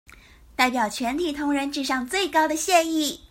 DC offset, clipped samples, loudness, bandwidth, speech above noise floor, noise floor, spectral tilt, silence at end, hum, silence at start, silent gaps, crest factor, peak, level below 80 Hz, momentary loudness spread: under 0.1%; under 0.1%; -23 LUFS; 16.5 kHz; 26 dB; -49 dBFS; -2 dB/octave; 0.05 s; none; 0.6 s; none; 18 dB; -6 dBFS; -54 dBFS; 6 LU